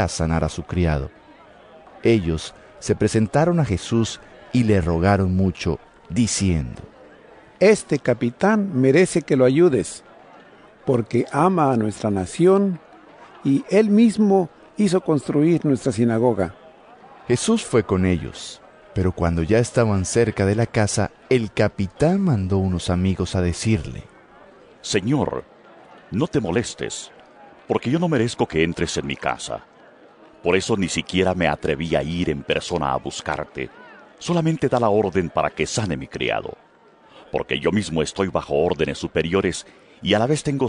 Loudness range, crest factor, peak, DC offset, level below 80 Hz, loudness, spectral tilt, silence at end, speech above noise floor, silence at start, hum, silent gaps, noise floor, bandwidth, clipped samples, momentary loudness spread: 5 LU; 18 dB; -4 dBFS; under 0.1%; -44 dBFS; -21 LUFS; -6 dB/octave; 0 s; 32 dB; 0 s; none; none; -52 dBFS; 11 kHz; under 0.1%; 12 LU